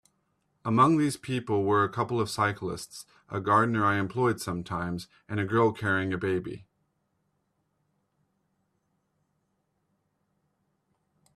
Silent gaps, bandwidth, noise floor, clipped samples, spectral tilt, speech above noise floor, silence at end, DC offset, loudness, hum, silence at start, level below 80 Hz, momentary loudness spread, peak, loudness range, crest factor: none; 14 kHz; -76 dBFS; under 0.1%; -6 dB/octave; 49 dB; 4.75 s; under 0.1%; -27 LUFS; none; 0.65 s; -64 dBFS; 15 LU; -10 dBFS; 7 LU; 20 dB